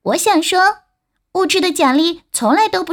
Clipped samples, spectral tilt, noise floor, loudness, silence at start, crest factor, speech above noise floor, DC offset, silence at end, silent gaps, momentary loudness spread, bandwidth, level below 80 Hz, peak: under 0.1%; -2 dB/octave; -69 dBFS; -15 LUFS; 0.05 s; 12 dB; 55 dB; under 0.1%; 0 s; none; 6 LU; over 20 kHz; -58 dBFS; -2 dBFS